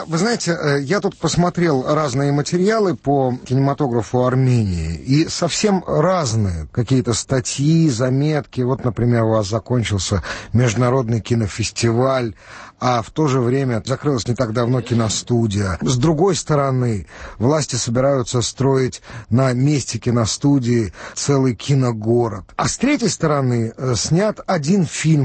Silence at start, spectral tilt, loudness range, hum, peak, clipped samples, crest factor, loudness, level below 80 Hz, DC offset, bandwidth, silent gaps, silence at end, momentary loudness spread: 0 s; -5.5 dB/octave; 1 LU; none; -4 dBFS; under 0.1%; 14 dB; -18 LUFS; -42 dBFS; under 0.1%; 8.8 kHz; none; 0 s; 5 LU